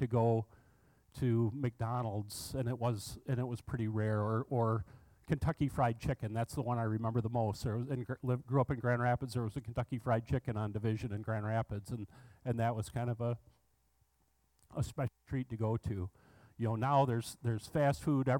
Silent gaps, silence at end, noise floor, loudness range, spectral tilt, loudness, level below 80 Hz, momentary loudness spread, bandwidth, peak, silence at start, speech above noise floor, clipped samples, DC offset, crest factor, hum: none; 0 s; -76 dBFS; 5 LU; -7.5 dB/octave; -36 LUFS; -58 dBFS; 8 LU; 16.5 kHz; -18 dBFS; 0 s; 41 dB; under 0.1%; under 0.1%; 16 dB; none